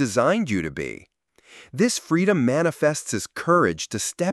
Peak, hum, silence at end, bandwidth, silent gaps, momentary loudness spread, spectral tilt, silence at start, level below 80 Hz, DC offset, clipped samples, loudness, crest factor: -6 dBFS; none; 0 s; 13.5 kHz; none; 11 LU; -4.5 dB/octave; 0 s; -56 dBFS; under 0.1%; under 0.1%; -22 LUFS; 16 dB